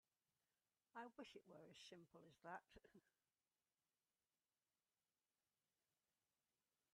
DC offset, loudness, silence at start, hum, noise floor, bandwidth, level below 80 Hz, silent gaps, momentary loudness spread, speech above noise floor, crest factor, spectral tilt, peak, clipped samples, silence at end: under 0.1%; -62 LUFS; 0.95 s; none; under -90 dBFS; 10.5 kHz; under -90 dBFS; none; 6 LU; over 26 dB; 26 dB; -4 dB/octave; -42 dBFS; under 0.1%; 3.85 s